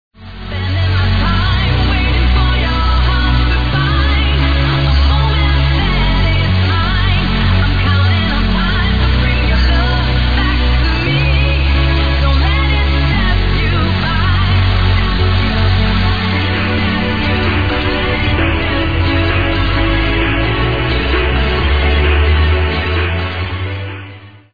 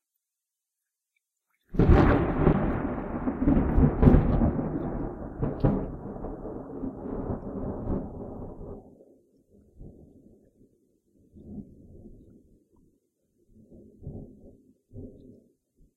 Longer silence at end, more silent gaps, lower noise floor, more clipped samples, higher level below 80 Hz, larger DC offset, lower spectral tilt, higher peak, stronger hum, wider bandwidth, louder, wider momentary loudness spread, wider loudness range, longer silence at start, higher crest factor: second, 0 s vs 0.85 s; neither; second, -34 dBFS vs -87 dBFS; neither; first, -16 dBFS vs -34 dBFS; first, 3% vs under 0.1%; second, -7.5 dB/octave vs -10.5 dB/octave; about the same, -2 dBFS vs -4 dBFS; neither; about the same, 5 kHz vs 5 kHz; first, -14 LUFS vs -27 LUFS; second, 2 LU vs 24 LU; second, 1 LU vs 26 LU; second, 0.1 s vs 1.7 s; second, 10 dB vs 26 dB